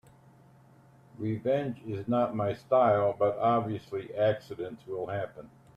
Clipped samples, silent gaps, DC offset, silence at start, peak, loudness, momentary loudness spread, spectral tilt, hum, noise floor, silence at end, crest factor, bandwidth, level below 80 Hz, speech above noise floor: under 0.1%; none; under 0.1%; 1.2 s; -12 dBFS; -30 LUFS; 13 LU; -8.5 dB/octave; none; -58 dBFS; 0.3 s; 18 dB; 8.6 kHz; -68 dBFS; 29 dB